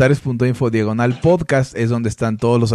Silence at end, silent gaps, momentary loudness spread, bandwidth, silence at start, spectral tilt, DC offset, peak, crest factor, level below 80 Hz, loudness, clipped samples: 0 s; none; 4 LU; 11.5 kHz; 0 s; -7 dB/octave; under 0.1%; -4 dBFS; 12 dB; -44 dBFS; -17 LUFS; under 0.1%